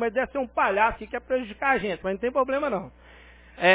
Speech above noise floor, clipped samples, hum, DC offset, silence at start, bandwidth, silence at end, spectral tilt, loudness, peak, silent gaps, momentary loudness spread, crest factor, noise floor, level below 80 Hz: 24 dB; under 0.1%; none; under 0.1%; 0 s; 4 kHz; 0 s; -8.5 dB/octave; -26 LUFS; -4 dBFS; none; 7 LU; 20 dB; -50 dBFS; -50 dBFS